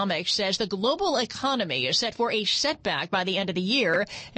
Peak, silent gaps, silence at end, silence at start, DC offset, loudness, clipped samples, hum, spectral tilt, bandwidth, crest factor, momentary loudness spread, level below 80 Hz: -12 dBFS; none; 0 s; 0 s; under 0.1%; -25 LUFS; under 0.1%; none; -3 dB/octave; 8.8 kHz; 14 dB; 4 LU; -60 dBFS